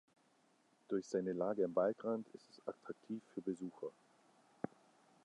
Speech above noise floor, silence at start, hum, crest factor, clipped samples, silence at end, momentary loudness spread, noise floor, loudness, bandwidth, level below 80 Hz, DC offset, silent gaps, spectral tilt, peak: 33 dB; 0.9 s; none; 20 dB; under 0.1%; 0.55 s; 14 LU; -74 dBFS; -42 LUFS; 11 kHz; -86 dBFS; under 0.1%; none; -7 dB/octave; -22 dBFS